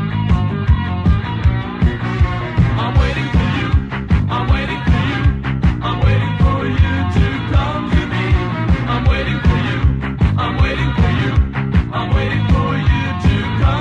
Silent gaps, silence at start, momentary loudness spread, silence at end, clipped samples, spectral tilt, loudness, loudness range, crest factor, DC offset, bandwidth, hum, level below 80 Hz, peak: none; 0 s; 2 LU; 0 s; under 0.1%; -7.5 dB/octave; -16 LUFS; 1 LU; 14 dB; under 0.1%; 7.6 kHz; none; -20 dBFS; -2 dBFS